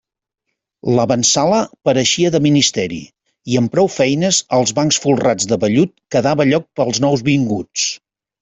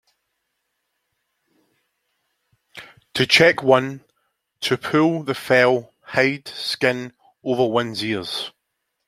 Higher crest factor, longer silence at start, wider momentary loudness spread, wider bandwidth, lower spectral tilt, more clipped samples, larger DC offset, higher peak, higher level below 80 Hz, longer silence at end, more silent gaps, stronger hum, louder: second, 14 dB vs 22 dB; second, 0.85 s vs 2.75 s; second, 7 LU vs 19 LU; second, 8.4 kHz vs 15.5 kHz; about the same, -4 dB/octave vs -4.5 dB/octave; neither; neither; about the same, -2 dBFS vs 0 dBFS; first, -52 dBFS vs -64 dBFS; second, 0.45 s vs 0.6 s; neither; neither; first, -15 LUFS vs -19 LUFS